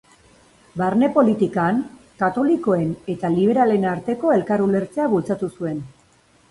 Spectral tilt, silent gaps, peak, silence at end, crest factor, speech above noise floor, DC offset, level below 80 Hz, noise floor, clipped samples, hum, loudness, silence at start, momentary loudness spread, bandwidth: -8.5 dB/octave; none; -4 dBFS; 0.6 s; 18 dB; 37 dB; under 0.1%; -56 dBFS; -56 dBFS; under 0.1%; none; -20 LUFS; 0.75 s; 9 LU; 11.5 kHz